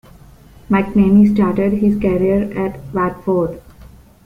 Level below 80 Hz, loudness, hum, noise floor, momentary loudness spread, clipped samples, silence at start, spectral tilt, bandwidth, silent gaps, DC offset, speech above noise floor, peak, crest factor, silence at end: -38 dBFS; -16 LUFS; none; -42 dBFS; 11 LU; under 0.1%; 0.7 s; -9.5 dB/octave; 4.8 kHz; none; under 0.1%; 28 dB; -2 dBFS; 14 dB; 0.4 s